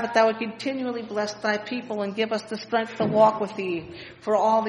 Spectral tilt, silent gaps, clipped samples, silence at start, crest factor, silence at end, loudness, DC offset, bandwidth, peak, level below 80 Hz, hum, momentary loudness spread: -5 dB/octave; none; under 0.1%; 0 s; 18 dB; 0 s; -25 LUFS; under 0.1%; 10 kHz; -6 dBFS; -66 dBFS; none; 10 LU